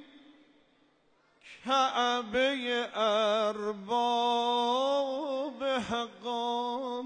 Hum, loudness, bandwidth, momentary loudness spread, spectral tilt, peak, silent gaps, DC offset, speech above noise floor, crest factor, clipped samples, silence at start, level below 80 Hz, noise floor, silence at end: none; -30 LUFS; 9.6 kHz; 7 LU; -3 dB/octave; -16 dBFS; none; under 0.1%; 39 dB; 14 dB; under 0.1%; 0 s; -70 dBFS; -68 dBFS; 0 s